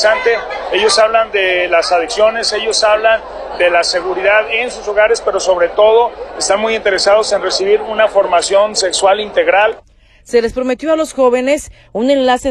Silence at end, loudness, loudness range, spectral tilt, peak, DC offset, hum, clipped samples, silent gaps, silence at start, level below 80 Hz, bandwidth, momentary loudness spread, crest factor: 0 s; -13 LUFS; 1 LU; -1.5 dB/octave; 0 dBFS; under 0.1%; none; under 0.1%; none; 0 s; -42 dBFS; 12 kHz; 6 LU; 12 dB